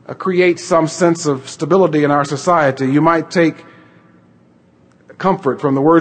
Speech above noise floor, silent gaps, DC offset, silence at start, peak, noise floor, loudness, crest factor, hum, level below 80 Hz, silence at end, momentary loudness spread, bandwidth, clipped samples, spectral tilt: 36 dB; none; under 0.1%; 0.1 s; 0 dBFS; -50 dBFS; -15 LUFS; 14 dB; none; -58 dBFS; 0 s; 6 LU; 9.2 kHz; under 0.1%; -6 dB/octave